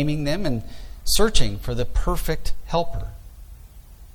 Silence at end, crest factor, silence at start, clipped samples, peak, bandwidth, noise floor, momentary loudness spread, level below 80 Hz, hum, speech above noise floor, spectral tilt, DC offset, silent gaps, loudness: 0.1 s; 18 dB; 0 s; under 0.1%; -4 dBFS; 16 kHz; -43 dBFS; 22 LU; -28 dBFS; none; 24 dB; -4.5 dB/octave; under 0.1%; none; -25 LUFS